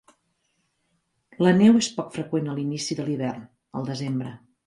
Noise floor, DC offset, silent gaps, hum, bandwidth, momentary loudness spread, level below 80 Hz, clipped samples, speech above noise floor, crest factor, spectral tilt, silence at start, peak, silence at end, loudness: -72 dBFS; under 0.1%; none; none; 11.5 kHz; 16 LU; -64 dBFS; under 0.1%; 50 dB; 18 dB; -6 dB/octave; 1.4 s; -6 dBFS; 0.3 s; -24 LUFS